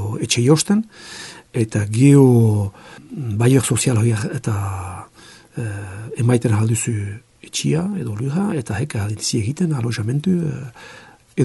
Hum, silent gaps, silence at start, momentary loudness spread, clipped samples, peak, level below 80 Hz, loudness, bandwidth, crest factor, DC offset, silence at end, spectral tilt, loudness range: none; none; 0 s; 17 LU; under 0.1%; 0 dBFS; -54 dBFS; -19 LUFS; 12 kHz; 18 dB; under 0.1%; 0 s; -6 dB/octave; 6 LU